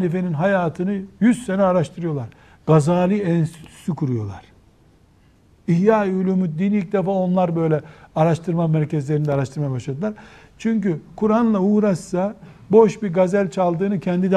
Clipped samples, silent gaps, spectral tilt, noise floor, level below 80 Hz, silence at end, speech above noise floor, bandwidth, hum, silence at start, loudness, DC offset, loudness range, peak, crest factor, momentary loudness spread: under 0.1%; none; -8 dB/octave; -54 dBFS; -54 dBFS; 0 s; 35 dB; 10.5 kHz; none; 0 s; -20 LUFS; under 0.1%; 4 LU; -2 dBFS; 18 dB; 10 LU